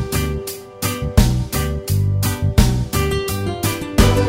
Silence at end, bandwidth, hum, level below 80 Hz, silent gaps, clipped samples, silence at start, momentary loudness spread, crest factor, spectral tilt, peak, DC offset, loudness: 0 s; 16.5 kHz; none; -24 dBFS; none; under 0.1%; 0 s; 7 LU; 18 dB; -5.5 dB/octave; 0 dBFS; under 0.1%; -19 LUFS